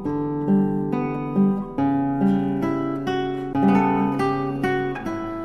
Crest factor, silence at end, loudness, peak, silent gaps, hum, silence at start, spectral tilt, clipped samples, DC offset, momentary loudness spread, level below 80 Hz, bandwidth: 14 dB; 0 s; -22 LUFS; -8 dBFS; none; none; 0 s; -8.5 dB/octave; under 0.1%; under 0.1%; 6 LU; -46 dBFS; 9.8 kHz